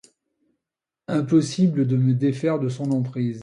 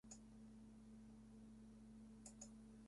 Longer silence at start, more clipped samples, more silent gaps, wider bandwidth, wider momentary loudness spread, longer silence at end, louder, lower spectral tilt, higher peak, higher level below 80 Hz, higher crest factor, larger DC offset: first, 1.1 s vs 0.05 s; neither; neither; about the same, 10.5 kHz vs 11.5 kHz; first, 7 LU vs 4 LU; about the same, 0 s vs 0 s; first, -22 LUFS vs -62 LUFS; first, -7.5 dB/octave vs -5 dB/octave; first, -8 dBFS vs -44 dBFS; first, -64 dBFS vs -72 dBFS; about the same, 16 dB vs 18 dB; neither